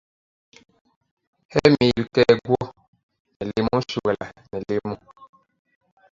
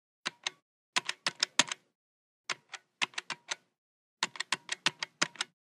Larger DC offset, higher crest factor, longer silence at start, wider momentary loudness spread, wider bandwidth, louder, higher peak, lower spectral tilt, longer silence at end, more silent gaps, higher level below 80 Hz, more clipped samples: neither; second, 24 dB vs 30 dB; first, 1.5 s vs 0.25 s; first, 16 LU vs 12 LU; second, 7.6 kHz vs 15.5 kHz; first, -21 LUFS vs -34 LUFS; first, 0 dBFS vs -8 dBFS; first, -6.5 dB/octave vs 0.5 dB/octave; first, 0.85 s vs 0.25 s; second, 2.88-2.93 s, 3.03-3.09 s, 3.20-3.25 s, 3.36-3.40 s vs 0.62-0.93 s, 1.95-2.44 s, 3.78-4.17 s; first, -52 dBFS vs under -90 dBFS; neither